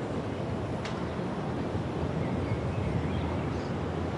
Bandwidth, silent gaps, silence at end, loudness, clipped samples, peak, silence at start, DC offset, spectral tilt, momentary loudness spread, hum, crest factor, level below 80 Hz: 11 kHz; none; 0 s; -32 LUFS; under 0.1%; -18 dBFS; 0 s; under 0.1%; -7.5 dB/octave; 3 LU; none; 14 dB; -46 dBFS